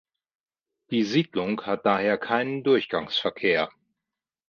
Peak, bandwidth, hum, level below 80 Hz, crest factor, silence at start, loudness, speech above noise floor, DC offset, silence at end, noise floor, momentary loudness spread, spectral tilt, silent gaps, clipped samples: -6 dBFS; 7 kHz; none; -66 dBFS; 20 dB; 0.9 s; -25 LUFS; 63 dB; under 0.1%; 0.8 s; -88 dBFS; 5 LU; -6 dB/octave; none; under 0.1%